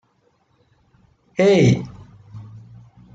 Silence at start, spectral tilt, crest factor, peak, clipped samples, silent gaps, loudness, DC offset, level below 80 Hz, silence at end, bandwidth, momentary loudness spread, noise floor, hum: 1.4 s; -7 dB/octave; 18 dB; -4 dBFS; under 0.1%; none; -17 LUFS; under 0.1%; -54 dBFS; 0.55 s; 7.8 kHz; 27 LU; -63 dBFS; none